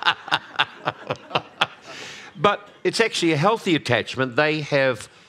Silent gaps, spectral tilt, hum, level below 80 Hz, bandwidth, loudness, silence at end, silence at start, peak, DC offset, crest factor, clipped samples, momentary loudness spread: none; -4.5 dB/octave; none; -66 dBFS; 14.5 kHz; -22 LUFS; 0.2 s; 0 s; 0 dBFS; under 0.1%; 22 dB; under 0.1%; 11 LU